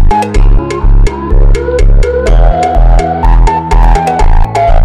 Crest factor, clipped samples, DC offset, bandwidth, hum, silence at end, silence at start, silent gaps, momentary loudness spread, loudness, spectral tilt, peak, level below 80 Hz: 4 dB; under 0.1%; under 0.1%; 9 kHz; none; 0 s; 0 s; none; 3 LU; -10 LUFS; -7 dB/octave; 0 dBFS; -6 dBFS